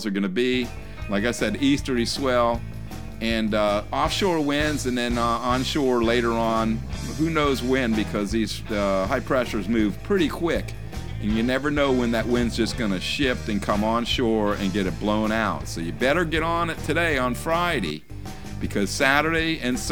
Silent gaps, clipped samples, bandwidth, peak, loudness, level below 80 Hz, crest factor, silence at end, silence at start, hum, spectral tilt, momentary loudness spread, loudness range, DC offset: none; under 0.1%; 19 kHz; -2 dBFS; -23 LUFS; -38 dBFS; 20 dB; 0 s; 0 s; none; -5 dB/octave; 8 LU; 2 LU; 1%